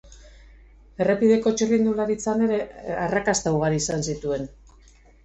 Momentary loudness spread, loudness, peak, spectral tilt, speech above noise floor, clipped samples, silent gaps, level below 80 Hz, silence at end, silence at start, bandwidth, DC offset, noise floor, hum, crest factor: 9 LU; -23 LUFS; -8 dBFS; -5 dB/octave; 30 dB; under 0.1%; none; -48 dBFS; 0.7 s; 0.05 s; 8.4 kHz; under 0.1%; -52 dBFS; none; 16 dB